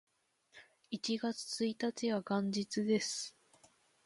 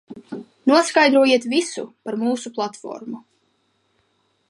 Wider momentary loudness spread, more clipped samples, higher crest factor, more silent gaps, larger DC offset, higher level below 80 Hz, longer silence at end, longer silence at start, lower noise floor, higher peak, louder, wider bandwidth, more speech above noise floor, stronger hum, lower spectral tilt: second, 8 LU vs 21 LU; neither; about the same, 18 dB vs 18 dB; neither; neither; second, -82 dBFS vs -76 dBFS; second, 0.75 s vs 1.3 s; first, 0.55 s vs 0.1 s; about the same, -70 dBFS vs -67 dBFS; second, -22 dBFS vs -4 dBFS; second, -37 LUFS vs -19 LUFS; about the same, 11.5 kHz vs 11.5 kHz; second, 34 dB vs 47 dB; neither; about the same, -4 dB/octave vs -3 dB/octave